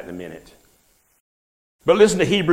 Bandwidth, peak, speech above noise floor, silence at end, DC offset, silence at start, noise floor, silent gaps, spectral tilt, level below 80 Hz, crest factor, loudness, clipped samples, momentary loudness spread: 15 kHz; -2 dBFS; 43 dB; 0 s; under 0.1%; 0 s; -61 dBFS; 1.20-1.79 s; -4.5 dB/octave; -52 dBFS; 18 dB; -17 LUFS; under 0.1%; 20 LU